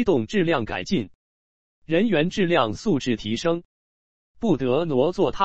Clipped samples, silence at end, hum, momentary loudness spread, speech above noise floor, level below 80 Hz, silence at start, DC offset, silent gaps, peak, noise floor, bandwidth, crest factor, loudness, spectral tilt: under 0.1%; 0 s; none; 6 LU; over 68 dB; -50 dBFS; 0 s; 1%; 1.15-1.82 s, 3.65-4.34 s; -6 dBFS; under -90 dBFS; 8.2 kHz; 18 dB; -23 LUFS; -6 dB/octave